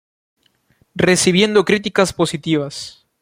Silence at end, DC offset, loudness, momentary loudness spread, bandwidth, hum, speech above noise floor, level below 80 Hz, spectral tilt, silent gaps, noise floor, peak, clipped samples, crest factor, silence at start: 0.3 s; under 0.1%; -16 LUFS; 17 LU; 16.5 kHz; none; 43 dB; -52 dBFS; -4 dB/octave; none; -59 dBFS; 0 dBFS; under 0.1%; 18 dB; 0.95 s